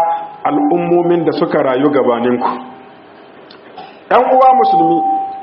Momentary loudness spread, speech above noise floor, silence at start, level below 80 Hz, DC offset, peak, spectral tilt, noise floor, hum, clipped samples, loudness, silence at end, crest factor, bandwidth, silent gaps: 10 LU; 27 dB; 0 s; -60 dBFS; under 0.1%; 0 dBFS; -5 dB/octave; -38 dBFS; none; under 0.1%; -13 LUFS; 0 s; 14 dB; 5.6 kHz; none